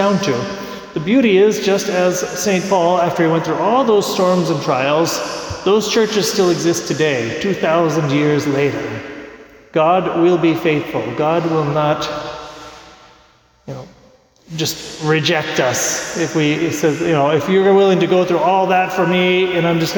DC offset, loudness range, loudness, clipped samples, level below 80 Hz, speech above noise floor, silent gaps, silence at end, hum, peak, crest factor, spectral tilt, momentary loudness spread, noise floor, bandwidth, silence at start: under 0.1%; 7 LU; -16 LUFS; under 0.1%; -52 dBFS; 36 dB; none; 0 s; none; -4 dBFS; 12 dB; -4.5 dB/octave; 11 LU; -51 dBFS; 19 kHz; 0 s